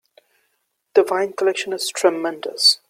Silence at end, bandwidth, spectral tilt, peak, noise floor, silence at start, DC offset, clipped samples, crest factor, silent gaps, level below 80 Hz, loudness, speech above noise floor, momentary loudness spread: 0.15 s; 15.5 kHz; -1.5 dB/octave; -2 dBFS; -71 dBFS; 0.95 s; under 0.1%; under 0.1%; 18 dB; none; -74 dBFS; -19 LUFS; 52 dB; 9 LU